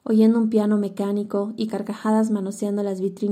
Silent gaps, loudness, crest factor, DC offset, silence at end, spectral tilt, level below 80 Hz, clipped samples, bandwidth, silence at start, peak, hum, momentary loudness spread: none; -22 LUFS; 14 dB; under 0.1%; 0 s; -7.5 dB/octave; -78 dBFS; under 0.1%; 13 kHz; 0.05 s; -8 dBFS; none; 9 LU